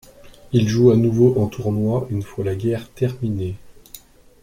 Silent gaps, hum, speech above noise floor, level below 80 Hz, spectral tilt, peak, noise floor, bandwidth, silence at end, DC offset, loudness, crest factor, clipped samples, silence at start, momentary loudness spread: none; none; 26 dB; -46 dBFS; -8 dB/octave; -2 dBFS; -45 dBFS; 15.5 kHz; 0.45 s; under 0.1%; -20 LUFS; 18 dB; under 0.1%; 0.25 s; 12 LU